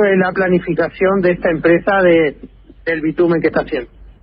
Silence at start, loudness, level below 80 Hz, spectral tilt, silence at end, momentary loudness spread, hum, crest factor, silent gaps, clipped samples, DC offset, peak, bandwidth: 0 s; -15 LUFS; -42 dBFS; -11.5 dB/octave; 0.15 s; 9 LU; none; 14 dB; none; under 0.1%; under 0.1%; 0 dBFS; 5.2 kHz